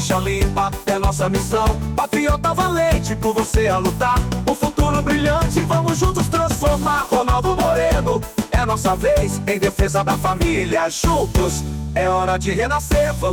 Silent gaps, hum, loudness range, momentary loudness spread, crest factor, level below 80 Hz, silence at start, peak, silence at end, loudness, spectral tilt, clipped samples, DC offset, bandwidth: none; none; 1 LU; 3 LU; 10 dB; -26 dBFS; 0 s; -6 dBFS; 0 s; -19 LUFS; -5.5 dB/octave; under 0.1%; under 0.1%; 19.5 kHz